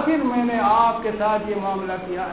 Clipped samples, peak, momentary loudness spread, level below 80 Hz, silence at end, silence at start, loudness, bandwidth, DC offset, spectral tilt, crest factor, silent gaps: under 0.1%; -6 dBFS; 9 LU; -50 dBFS; 0 s; 0 s; -21 LUFS; 4 kHz; 0.2%; -10 dB/octave; 14 dB; none